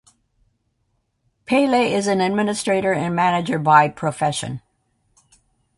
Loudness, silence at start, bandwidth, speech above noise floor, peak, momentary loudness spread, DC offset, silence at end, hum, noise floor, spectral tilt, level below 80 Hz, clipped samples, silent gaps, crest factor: -19 LUFS; 1.5 s; 11.5 kHz; 51 dB; 0 dBFS; 8 LU; under 0.1%; 1.2 s; none; -70 dBFS; -5 dB/octave; -58 dBFS; under 0.1%; none; 20 dB